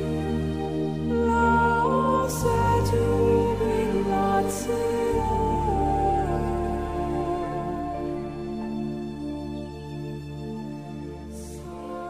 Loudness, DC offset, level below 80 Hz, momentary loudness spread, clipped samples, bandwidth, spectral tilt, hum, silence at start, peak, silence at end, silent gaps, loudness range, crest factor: -25 LUFS; 0.2%; -38 dBFS; 14 LU; under 0.1%; 16 kHz; -6.5 dB/octave; none; 0 s; -10 dBFS; 0 s; none; 11 LU; 16 dB